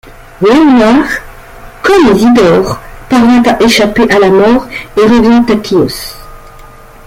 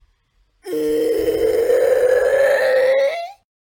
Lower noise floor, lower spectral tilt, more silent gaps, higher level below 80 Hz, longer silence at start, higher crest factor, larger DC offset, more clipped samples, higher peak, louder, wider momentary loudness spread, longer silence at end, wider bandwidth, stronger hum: second, -32 dBFS vs -62 dBFS; first, -5.5 dB/octave vs -4 dB/octave; neither; first, -32 dBFS vs -50 dBFS; second, 0.05 s vs 0.65 s; about the same, 8 dB vs 12 dB; neither; neither; first, 0 dBFS vs -6 dBFS; first, -7 LUFS vs -17 LUFS; about the same, 10 LU vs 9 LU; about the same, 0.4 s vs 0.3 s; about the same, 16 kHz vs 17 kHz; neither